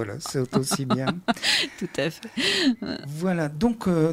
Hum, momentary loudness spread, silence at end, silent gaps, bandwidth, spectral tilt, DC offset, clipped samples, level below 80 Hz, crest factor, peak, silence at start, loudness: none; 8 LU; 0 s; none; 16.5 kHz; -4.5 dB/octave; under 0.1%; under 0.1%; -54 dBFS; 18 dB; -8 dBFS; 0 s; -25 LUFS